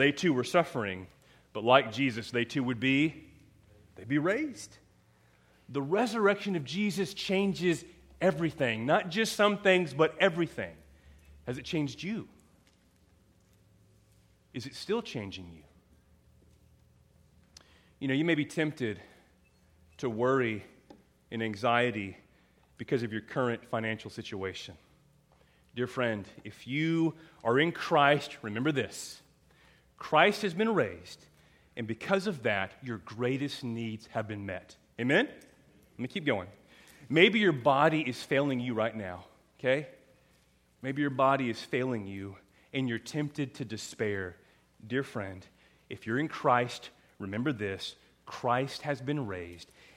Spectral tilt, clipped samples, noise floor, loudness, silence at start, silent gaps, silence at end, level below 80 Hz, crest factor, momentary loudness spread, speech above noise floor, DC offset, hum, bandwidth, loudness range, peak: -5.5 dB/octave; under 0.1%; -66 dBFS; -31 LUFS; 0 s; none; 0.35 s; -68 dBFS; 26 dB; 17 LU; 36 dB; under 0.1%; none; 16 kHz; 12 LU; -6 dBFS